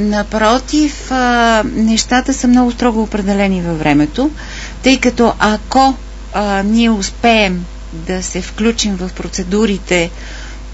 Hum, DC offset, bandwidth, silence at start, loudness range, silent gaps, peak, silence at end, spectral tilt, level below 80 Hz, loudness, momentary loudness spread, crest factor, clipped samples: none; under 0.1%; 8 kHz; 0 s; 3 LU; none; 0 dBFS; 0 s; -4.5 dB/octave; -28 dBFS; -13 LUFS; 11 LU; 14 dB; under 0.1%